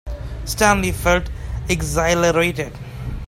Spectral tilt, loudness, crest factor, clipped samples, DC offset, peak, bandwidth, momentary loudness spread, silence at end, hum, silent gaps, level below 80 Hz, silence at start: -4.5 dB/octave; -19 LUFS; 20 dB; under 0.1%; under 0.1%; 0 dBFS; 16 kHz; 14 LU; 0 s; none; none; -30 dBFS; 0.05 s